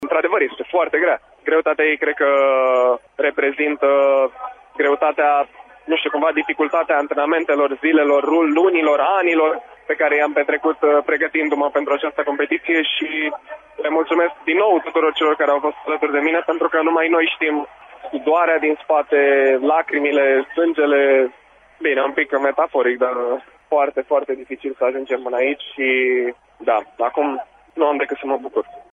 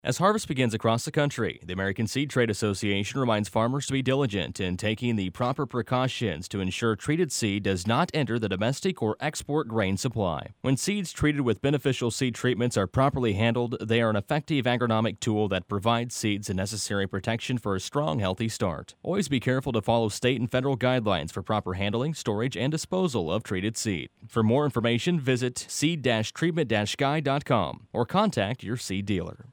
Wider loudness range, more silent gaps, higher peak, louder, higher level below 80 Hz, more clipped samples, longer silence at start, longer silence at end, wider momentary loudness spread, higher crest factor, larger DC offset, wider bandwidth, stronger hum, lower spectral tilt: about the same, 4 LU vs 2 LU; neither; first, -4 dBFS vs -8 dBFS; first, -18 LUFS vs -27 LUFS; second, -64 dBFS vs -54 dBFS; neither; about the same, 0 s vs 0.05 s; about the same, 0.1 s vs 0 s; first, 8 LU vs 5 LU; about the same, 14 dB vs 18 dB; neither; second, 7.4 kHz vs 19 kHz; neither; about the same, -4.5 dB/octave vs -5.5 dB/octave